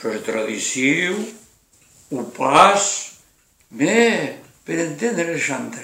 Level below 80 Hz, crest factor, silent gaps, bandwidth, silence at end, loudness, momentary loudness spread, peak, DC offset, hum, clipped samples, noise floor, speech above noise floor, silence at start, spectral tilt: -64 dBFS; 20 dB; none; 16 kHz; 0 s; -19 LUFS; 17 LU; 0 dBFS; under 0.1%; none; under 0.1%; -57 dBFS; 38 dB; 0 s; -3 dB/octave